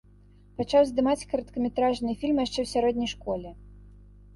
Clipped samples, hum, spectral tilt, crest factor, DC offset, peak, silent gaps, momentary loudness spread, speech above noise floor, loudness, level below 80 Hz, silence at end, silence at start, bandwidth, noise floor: under 0.1%; 50 Hz at -45 dBFS; -5 dB/octave; 18 dB; under 0.1%; -10 dBFS; none; 12 LU; 28 dB; -27 LUFS; -50 dBFS; 0.4 s; 0.6 s; 11.5 kHz; -54 dBFS